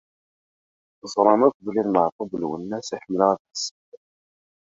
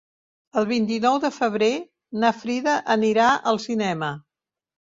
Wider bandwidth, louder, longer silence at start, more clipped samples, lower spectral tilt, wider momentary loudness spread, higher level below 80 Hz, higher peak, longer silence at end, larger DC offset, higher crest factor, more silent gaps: about the same, 7.8 kHz vs 7.8 kHz; about the same, -23 LUFS vs -22 LUFS; first, 1.05 s vs 0.55 s; neither; about the same, -5 dB/octave vs -5 dB/octave; about the same, 12 LU vs 10 LU; about the same, -66 dBFS vs -66 dBFS; first, -2 dBFS vs -6 dBFS; about the same, 0.7 s vs 0.75 s; neither; about the same, 22 dB vs 18 dB; first, 1.54-1.60 s, 2.12-2.19 s, 3.40-3.45 s, 3.71-3.92 s vs none